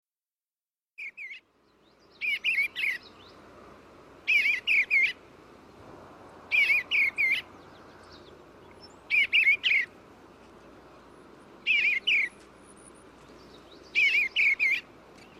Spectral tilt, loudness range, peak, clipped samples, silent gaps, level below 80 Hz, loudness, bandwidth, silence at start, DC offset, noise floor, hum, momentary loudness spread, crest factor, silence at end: -1 dB/octave; 6 LU; -14 dBFS; under 0.1%; none; -68 dBFS; -24 LUFS; 15 kHz; 1 s; under 0.1%; under -90 dBFS; none; 17 LU; 16 dB; 0.6 s